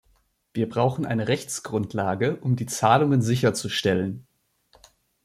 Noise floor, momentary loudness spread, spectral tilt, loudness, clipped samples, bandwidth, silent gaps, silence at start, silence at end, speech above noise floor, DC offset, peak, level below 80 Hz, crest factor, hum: -65 dBFS; 9 LU; -5.5 dB/octave; -24 LUFS; under 0.1%; 15 kHz; none; 0.55 s; 1.05 s; 42 dB; under 0.1%; -4 dBFS; -60 dBFS; 20 dB; none